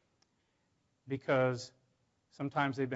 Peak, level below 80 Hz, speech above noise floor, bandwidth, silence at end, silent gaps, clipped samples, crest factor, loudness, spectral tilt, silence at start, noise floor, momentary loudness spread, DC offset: -18 dBFS; -78 dBFS; 44 dB; 7.6 kHz; 0 s; none; under 0.1%; 20 dB; -35 LUFS; -5 dB/octave; 1.05 s; -78 dBFS; 12 LU; under 0.1%